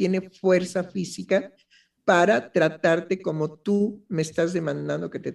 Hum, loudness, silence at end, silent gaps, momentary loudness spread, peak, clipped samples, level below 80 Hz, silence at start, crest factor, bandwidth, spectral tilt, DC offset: none; -24 LUFS; 0 s; none; 9 LU; -4 dBFS; under 0.1%; -66 dBFS; 0 s; 20 dB; 12 kHz; -6 dB/octave; under 0.1%